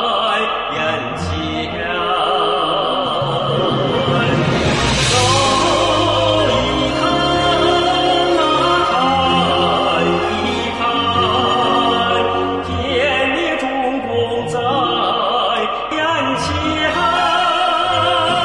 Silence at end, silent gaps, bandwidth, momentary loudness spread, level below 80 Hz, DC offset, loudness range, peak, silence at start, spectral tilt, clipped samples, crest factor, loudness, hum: 0 s; none; 11.5 kHz; 5 LU; -38 dBFS; 0.2%; 3 LU; -2 dBFS; 0 s; -4 dB/octave; under 0.1%; 12 dB; -15 LUFS; none